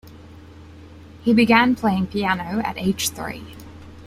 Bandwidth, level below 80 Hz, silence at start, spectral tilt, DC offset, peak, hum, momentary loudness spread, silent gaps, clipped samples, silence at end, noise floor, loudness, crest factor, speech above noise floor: 16 kHz; -50 dBFS; 0.05 s; -4.5 dB/octave; under 0.1%; -2 dBFS; none; 22 LU; none; under 0.1%; 0 s; -42 dBFS; -20 LUFS; 20 dB; 23 dB